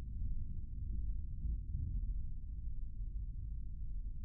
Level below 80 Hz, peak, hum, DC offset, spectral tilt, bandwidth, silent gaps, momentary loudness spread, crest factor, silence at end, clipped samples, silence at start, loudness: -40 dBFS; -28 dBFS; none; under 0.1%; -20.5 dB/octave; 0.5 kHz; none; 5 LU; 10 dB; 0 s; under 0.1%; 0 s; -46 LUFS